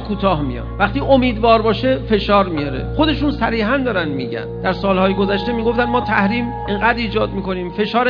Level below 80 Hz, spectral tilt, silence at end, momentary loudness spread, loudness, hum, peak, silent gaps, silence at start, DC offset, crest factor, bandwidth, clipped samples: -30 dBFS; -8.5 dB/octave; 0 s; 8 LU; -17 LUFS; none; 0 dBFS; none; 0 s; under 0.1%; 16 dB; 6.8 kHz; under 0.1%